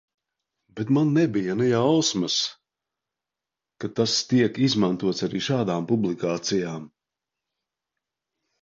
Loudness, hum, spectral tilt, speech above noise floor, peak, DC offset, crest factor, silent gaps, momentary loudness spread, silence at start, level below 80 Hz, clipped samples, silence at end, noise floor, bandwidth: -23 LUFS; none; -5 dB/octave; 65 dB; -8 dBFS; under 0.1%; 18 dB; none; 11 LU; 0.75 s; -64 dBFS; under 0.1%; 1.75 s; -88 dBFS; 7.8 kHz